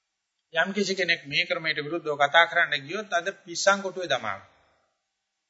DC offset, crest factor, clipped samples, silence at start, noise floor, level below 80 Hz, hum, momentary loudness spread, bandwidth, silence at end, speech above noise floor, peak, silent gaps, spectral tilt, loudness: under 0.1%; 22 dB; under 0.1%; 0.55 s; -81 dBFS; -76 dBFS; none; 11 LU; 8 kHz; 1.1 s; 55 dB; -4 dBFS; none; -2.5 dB/octave; -25 LUFS